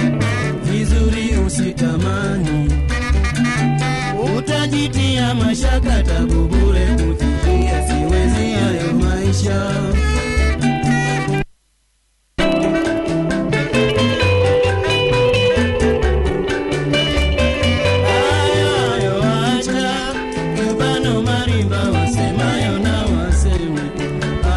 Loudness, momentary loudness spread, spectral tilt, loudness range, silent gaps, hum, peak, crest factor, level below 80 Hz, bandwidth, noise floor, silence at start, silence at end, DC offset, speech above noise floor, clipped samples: -17 LUFS; 4 LU; -5.5 dB/octave; 3 LU; none; none; -4 dBFS; 12 dB; -22 dBFS; 11.5 kHz; -61 dBFS; 0 s; 0 s; under 0.1%; 46 dB; under 0.1%